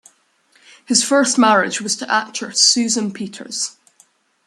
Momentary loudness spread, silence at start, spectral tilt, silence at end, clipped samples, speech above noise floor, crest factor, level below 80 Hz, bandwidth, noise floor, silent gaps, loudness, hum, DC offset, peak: 13 LU; 0.9 s; -1.5 dB/octave; 0.75 s; under 0.1%; 41 dB; 20 dB; -68 dBFS; 12.5 kHz; -58 dBFS; none; -16 LUFS; none; under 0.1%; 0 dBFS